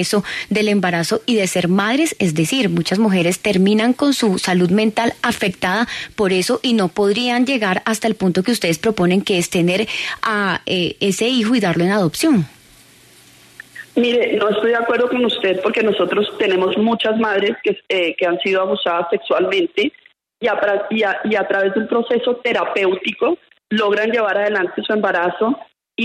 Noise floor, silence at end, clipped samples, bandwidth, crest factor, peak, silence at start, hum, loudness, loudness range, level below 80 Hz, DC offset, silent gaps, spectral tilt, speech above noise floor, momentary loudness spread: -47 dBFS; 0 s; under 0.1%; 13.5 kHz; 14 dB; -4 dBFS; 0 s; none; -17 LUFS; 3 LU; -56 dBFS; under 0.1%; none; -4.5 dB/octave; 30 dB; 4 LU